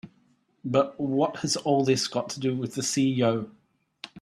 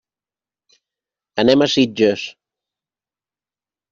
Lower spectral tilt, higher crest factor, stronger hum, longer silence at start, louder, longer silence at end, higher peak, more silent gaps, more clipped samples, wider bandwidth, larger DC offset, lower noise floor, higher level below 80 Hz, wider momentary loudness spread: about the same, -4.5 dB/octave vs -5 dB/octave; about the same, 18 dB vs 18 dB; neither; second, 0.05 s vs 1.35 s; second, -26 LUFS vs -16 LUFS; second, 0 s vs 1.6 s; second, -8 dBFS vs -2 dBFS; neither; neither; first, 13.5 kHz vs 7.4 kHz; neither; second, -66 dBFS vs under -90 dBFS; second, -68 dBFS vs -62 dBFS; about the same, 14 LU vs 14 LU